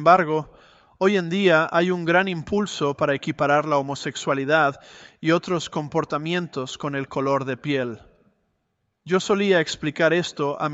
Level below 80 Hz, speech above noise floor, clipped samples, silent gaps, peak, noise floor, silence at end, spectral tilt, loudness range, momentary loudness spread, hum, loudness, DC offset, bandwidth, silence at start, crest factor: -60 dBFS; 52 dB; under 0.1%; none; -2 dBFS; -74 dBFS; 0 s; -5.5 dB/octave; 6 LU; 9 LU; none; -22 LUFS; under 0.1%; 8.2 kHz; 0 s; 20 dB